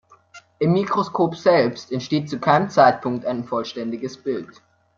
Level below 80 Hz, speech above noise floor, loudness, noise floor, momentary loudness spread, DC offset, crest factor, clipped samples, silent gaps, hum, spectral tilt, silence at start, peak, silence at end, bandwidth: -62 dBFS; 28 dB; -21 LUFS; -49 dBFS; 12 LU; under 0.1%; 20 dB; under 0.1%; none; none; -6.5 dB/octave; 0.35 s; -2 dBFS; 0.5 s; 7.6 kHz